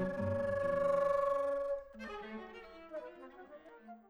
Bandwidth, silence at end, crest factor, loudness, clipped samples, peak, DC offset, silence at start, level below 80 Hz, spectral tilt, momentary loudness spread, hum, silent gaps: 10 kHz; 0.1 s; 14 dB; -36 LUFS; under 0.1%; -22 dBFS; under 0.1%; 0 s; -64 dBFS; -7.5 dB/octave; 22 LU; none; none